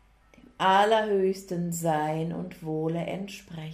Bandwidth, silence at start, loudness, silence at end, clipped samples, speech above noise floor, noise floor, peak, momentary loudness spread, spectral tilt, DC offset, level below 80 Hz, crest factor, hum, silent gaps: 15.5 kHz; 0.6 s; -27 LUFS; 0 s; under 0.1%; 29 dB; -56 dBFS; -10 dBFS; 14 LU; -5 dB/octave; under 0.1%; -62 dBFS; 18 dB; none; none